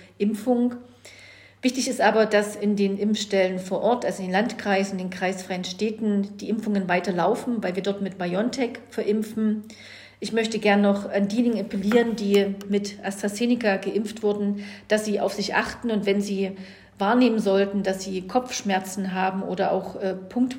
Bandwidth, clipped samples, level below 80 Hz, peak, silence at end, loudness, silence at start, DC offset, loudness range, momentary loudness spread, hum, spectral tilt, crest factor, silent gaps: 16 kHz; under 0.1%; -62 dBFS; -4 dBFS; 0 s; -24 LUFS; 0 s; under 0.1%; 3 LU; 8 LU; none; -5 dB/octave; 20 dB; none